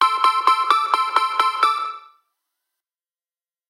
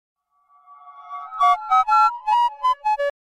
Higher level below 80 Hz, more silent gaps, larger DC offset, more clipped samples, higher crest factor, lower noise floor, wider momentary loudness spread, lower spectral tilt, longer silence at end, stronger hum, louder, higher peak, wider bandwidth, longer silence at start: second, -86 dBFS vs -62 dBFS; neither; neither; neither; first, 22 dB vs 14 dB; first, under -90 dBFS vs -59 dBFS; second, 9 LU vs 17 LU; about the same, 2 dB/octave vs 1 dB/octave; first, 1.7 s vs 0.15 s; neither; about the same, -18 LUFS vs -19 LUFS; first, 0 dBFS vs -8 dBFS; first, 17 kHz vs 13 kHz; second, 0 s vs 0.85 s